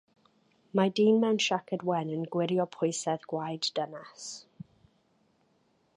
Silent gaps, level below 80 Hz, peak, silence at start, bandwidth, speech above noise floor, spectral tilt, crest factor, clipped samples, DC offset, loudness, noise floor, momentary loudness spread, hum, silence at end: none; -78 dBFS; -12 dBFS; 0.75 s; 11 kHz; 41 dB; -5 dB/octave; 20 dB; under 0.1%; under 0.1%; -29 LUFS; -70 dBFS; 17 LU; none; 1.55 s